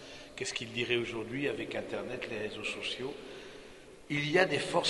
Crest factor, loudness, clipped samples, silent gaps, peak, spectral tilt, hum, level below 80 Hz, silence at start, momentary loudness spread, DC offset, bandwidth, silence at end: 24 dB; -34 LUFS; under 0.1%; none; -10 dBFS; -4 dB/octave; none; -64 dBFS; 0 s; 19 LU; under 0.1%; 11.5 kHz; 0 s